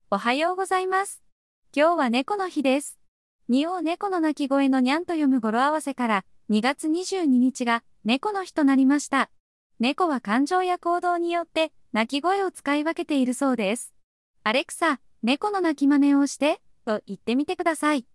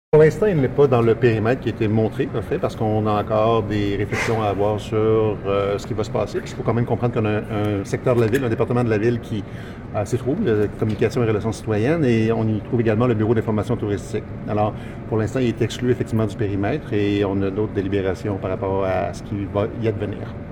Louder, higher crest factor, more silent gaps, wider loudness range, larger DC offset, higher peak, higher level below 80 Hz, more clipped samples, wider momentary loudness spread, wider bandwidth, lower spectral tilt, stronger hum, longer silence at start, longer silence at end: second, -24 LUFS vs -21 LUFS; about the same, 16 dB vs 16 dB; first, 1.32-1.62 s, 3.08-3.39 s, 9.40-9.70 s, 14.03-14.34 s vs none; about the same, 2 LU vs 3 LU; neither; second, -8 dBFS vs -4 dBFS; second, -70 dBFS vs -42 dBFS; neither; about the same, 6 LU vs 7 LU; about the same, 12 kHz vs 13 kHz; second, -4 dB/octave vs -7.5 dB/octave; neither; about the same, 0.1 s vs 0.15 s; first, 0.15 s vs 0 s